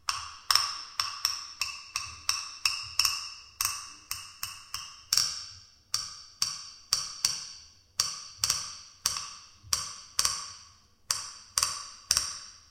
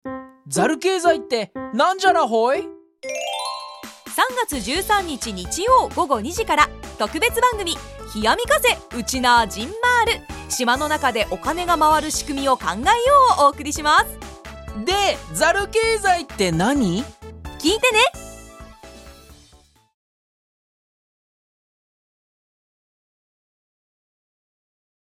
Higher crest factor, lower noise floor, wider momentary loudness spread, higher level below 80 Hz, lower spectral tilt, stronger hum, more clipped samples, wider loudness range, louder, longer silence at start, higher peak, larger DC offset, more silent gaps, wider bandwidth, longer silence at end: first, 30 dB vs 20 dB; about the same, -57 dBFS vs -54 dBFS; about the same, 14 LU vs 13 LU; second, -60 dBFS vs -42 dBFS; second, 2 dB/octave vs -3 dB/octave; neither; neither; second, 2 LU vs 5 LU; second, -30 LUFS vs -19 LUFS; about the same, 0.05 s vs 0.05 s; second, -4 dBFS vs 0 dBFS; neither; neither; about the same, 17 kHz vs 16 kHz; second, 0.1 s vs 5.75 s